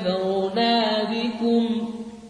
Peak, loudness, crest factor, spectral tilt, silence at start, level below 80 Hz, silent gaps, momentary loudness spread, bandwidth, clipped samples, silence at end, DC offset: -10 dBFS; -23 LUFS; 12 dB; -6 dB/octave; 0 s; -62 dBFS; none; 6 LU; 10 kHz; under 0.1%; 0 s; under 0.1%